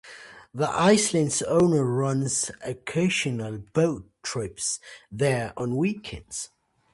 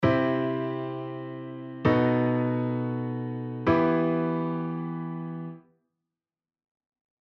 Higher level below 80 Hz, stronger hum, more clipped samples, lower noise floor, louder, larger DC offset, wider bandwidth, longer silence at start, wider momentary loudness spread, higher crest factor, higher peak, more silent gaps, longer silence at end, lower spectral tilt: about the same, -56 dBFS vs -58 dBFS; neither; neither; second, -46 dBFS vs under -90 dBFS; first, -25 LUFS vs -28 LUFS; neither; first, 11.5 kHz vs 6 kHz; about the same, 0.05 s vs 0 s; about the same, 14 LU vs 14 LU; about the same, 18 dB vs 20 dB; about the same, -8 dBFS vs -8 dBFS; neither; second, 0.5 s vs 1.7 s; second, -4.5 dB/octave vs -9.5 dB/octave